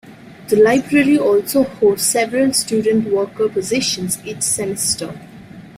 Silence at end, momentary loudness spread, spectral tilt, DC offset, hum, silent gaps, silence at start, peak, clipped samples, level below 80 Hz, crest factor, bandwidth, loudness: 0 s; 8 LU; -3.5 dB/octave; under 0.1%; none; none; 0.05 s; -2 dBFS; under 0.1%; -52 dBFS; 14 dB; 16 kHz; -16 LUFS